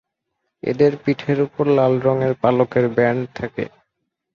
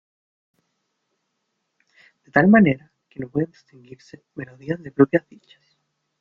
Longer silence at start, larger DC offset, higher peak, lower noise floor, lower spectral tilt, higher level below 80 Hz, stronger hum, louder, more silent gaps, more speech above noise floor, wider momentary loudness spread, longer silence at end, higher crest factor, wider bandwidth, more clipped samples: second, 0.65 s vs 2.35 s; neither; about the same, -2 dBFS vs -2 dBFS; about the same, -76 dBFS vs -76 dBFS; about the same, -9 dB/octave vs -9.5 dB/octave; about the same, -56 dBFS vs -60 dBFS; neither; about the same, -19 LUFS vs -20 LUFS; neither; about the same, 58 dB vs 55 dB; second, 11 LU vs 23 LU; second, 0.65 s vs 1 s; about the same, 18 dB vs 22 dB; about the same, 6.8 kHz vs 6.4 kHz; neither